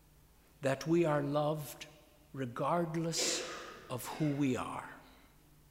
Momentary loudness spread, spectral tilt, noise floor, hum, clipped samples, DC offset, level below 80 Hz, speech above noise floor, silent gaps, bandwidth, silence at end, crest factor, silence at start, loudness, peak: 16 LU; -4.5 dB/octave; -63 dBFS; none; under 0.1%; under 0.1%; -68 dBFS; 29 dB; none; 16 kHz; 0.55 s; 18 dB; 0.6 s; -35 LUFS; -20 dBFS